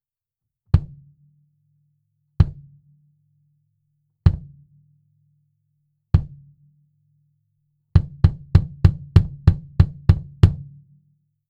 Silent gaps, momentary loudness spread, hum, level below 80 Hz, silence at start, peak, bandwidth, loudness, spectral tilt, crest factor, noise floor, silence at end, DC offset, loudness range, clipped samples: none; 5 LU; none; -30 dBFS; 0.75 s; 0 dBFS; 5.6 kHz; -20 LUFS; -9.5 dB/octave; 22 dB; -86 dBFS; 0.9 s; under 0.1%; 11 LU; under 0.1%